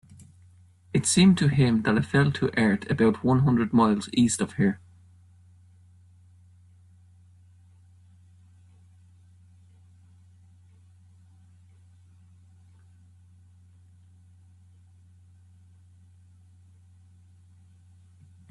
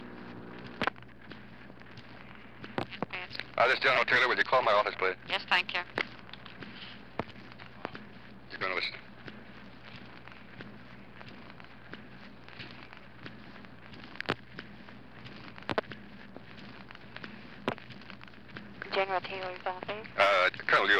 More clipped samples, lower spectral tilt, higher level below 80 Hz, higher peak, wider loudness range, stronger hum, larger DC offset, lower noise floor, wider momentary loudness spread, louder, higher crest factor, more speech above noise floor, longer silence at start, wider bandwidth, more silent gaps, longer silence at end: neither; about the same, -5.5 dB/octave vs -4.5 dB/octave; about the same, -60 dBFS vs -64 dBFS; about the same, -8 dBFS vs -10 dBFS; second, 10 LU vs 21 LU; neither; second, under 0.1% vs 0.2%; first, -55 dBFS vs -51 dBFS; second, 7 LU vs 24 LU; first, -23 LUFS vs -30 LUFS; about the same, 20 dB vs 24 dB; first, 33 dB vs 22 dB; first, 0.95 s vs 0 s; about the same, 12.5 kHz vs 13.5 kHz; neither; first, 13.75 s vs 0 s